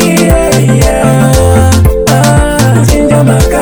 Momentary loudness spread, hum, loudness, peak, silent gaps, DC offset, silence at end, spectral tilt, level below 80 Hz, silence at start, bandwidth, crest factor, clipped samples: 1 LU; none; -7 LUFS; 0 dBFS; none; under 0.1%; 0 s; -5.5 dB/octave; -14 dBFS; 0 s; over 20 kHz; 6 dB; 0.3%